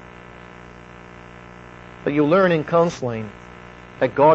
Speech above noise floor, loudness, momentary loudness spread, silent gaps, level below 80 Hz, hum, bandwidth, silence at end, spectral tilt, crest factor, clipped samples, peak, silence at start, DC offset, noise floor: 24 dB; -20 LUFS; 24 LU; none; -52 dBFS; 60 Hz at -45 dBFS; 8 kHz; 0 s; -7 dB/octave; 16 dB; under 0.1%; -4 dBFS; 0.35 s; under 0.1%; -41 dBFS